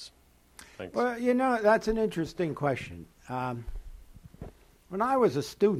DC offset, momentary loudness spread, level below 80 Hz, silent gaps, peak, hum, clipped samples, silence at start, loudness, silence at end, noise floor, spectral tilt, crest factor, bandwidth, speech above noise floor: under 0.1%; 23 LU; -50 dBFS; none; -12 dBFS; none; under 0.1%; 0 s; -29 LUFS; 0 s; -61 dBFS; -6.5 dB/octave; 18 dB; 15 kHz; 33 dB